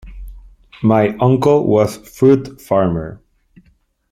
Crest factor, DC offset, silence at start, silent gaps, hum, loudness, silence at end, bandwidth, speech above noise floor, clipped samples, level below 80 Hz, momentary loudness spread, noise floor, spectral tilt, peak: 14 dB; under 0.1%; 0.05 s; none; none; -15 LUFS; 0.95 s; 15.5 kHz; 43 dB; under 0.1%; -40 dBFS; 7 LU; -57 dBFS; -8 dB/octave; -2 dBFS